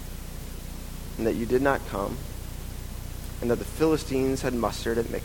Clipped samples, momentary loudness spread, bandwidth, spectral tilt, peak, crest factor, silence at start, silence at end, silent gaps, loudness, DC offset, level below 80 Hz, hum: under 0.1%; 15 LU; 17.5 kHz; -5.5 dB/octave; -8 dBFS; 20 dB; 0 s; 0 s; none; -28 LUFS; under 0.1%; -38 dBFS; none